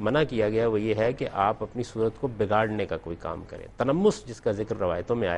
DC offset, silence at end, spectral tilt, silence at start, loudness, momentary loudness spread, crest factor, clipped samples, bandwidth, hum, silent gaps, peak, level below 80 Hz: under 0.1%; 0 s; -6.5 dB/octave; 0 s; -27 LUFS; 9 LU; 18 dB; under 0.1%; 10 kHz; none; none; -8 dBFS; -50 dBFS